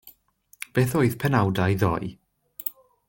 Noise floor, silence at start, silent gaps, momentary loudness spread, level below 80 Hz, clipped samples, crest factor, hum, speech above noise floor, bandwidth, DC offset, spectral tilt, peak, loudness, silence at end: -59 dBFS; 0.05 s; none; 15 LU; -52 dBFS; under 0.1%; 18 dB; none; 37 dB; 17 kHz; under 0.1%; -6.5 dB/octave; -6 dBFS; -24 LUFS; 0.4 s